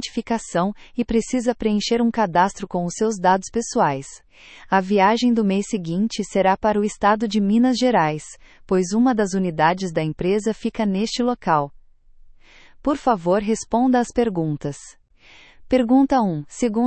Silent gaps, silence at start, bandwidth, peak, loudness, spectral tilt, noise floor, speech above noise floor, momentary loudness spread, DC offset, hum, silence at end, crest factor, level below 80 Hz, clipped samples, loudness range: none; 0 s; 8.8 kHz; -2 dBFS; -20 LUFS; -5.5 dB/octave; -49 dBFS; 29 dB; 8 LU; under 0.1%; none; 0 s; 18 dB; -48 dBFS; under 0.1%; 3 LU